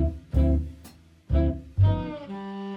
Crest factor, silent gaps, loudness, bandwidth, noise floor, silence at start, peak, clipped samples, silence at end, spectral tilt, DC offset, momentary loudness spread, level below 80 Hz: 16 dB; none; -26 LUFS; 5.2 kHz; -50 dBFS; 0 s; -10 dBFS; under 0.1%; 0 s; -9.5 dB/octave; under 0.1%; 13 LU; -30 dBFS